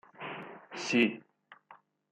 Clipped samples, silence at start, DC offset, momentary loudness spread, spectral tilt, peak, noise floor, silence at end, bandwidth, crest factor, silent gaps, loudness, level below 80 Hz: under 0.1%; 0.2 s; under 0.1%; 17 LU; -4 dB/octave; -14 dBFS; -60 dBFS; 0.35 s; 9 kHz; 22 dB; none; -31 LUFS; -84 dBFS